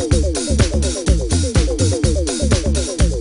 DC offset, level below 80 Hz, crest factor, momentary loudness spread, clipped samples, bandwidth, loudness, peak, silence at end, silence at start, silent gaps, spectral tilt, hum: under 0.1%; -20 dBFS; 14 dB; 2 LU; under 0.1%; 11 kHz; -17 LUFS; -2 dBFS; 0 s; 0 s; none; -5 dB/octave; none